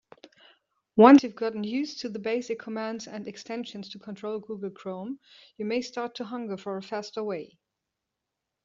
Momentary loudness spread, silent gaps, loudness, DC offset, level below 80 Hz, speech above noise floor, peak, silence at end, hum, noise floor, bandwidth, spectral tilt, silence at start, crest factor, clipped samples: 19 LU; none; -27 LUFS; under 0.1%; -74 dBFS; 59 dB; -2 dBFS; 1.2 s; none; -85 dBFS; 7.4 kHz; -4.5 dB/octave; 0.95 s; 24 dB; under 0.1%